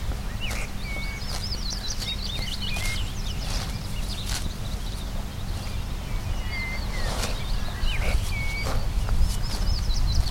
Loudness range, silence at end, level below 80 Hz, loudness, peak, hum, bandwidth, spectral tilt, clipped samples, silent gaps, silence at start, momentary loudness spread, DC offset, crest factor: 3 LU; 0 s; -28 dBFS; -30 LUFS; -8 dBFS; none; 16.5 kHz; -4 dB/octave; under 0.1%; none; 0 s; 6 LU; under 0.1%; 18 dB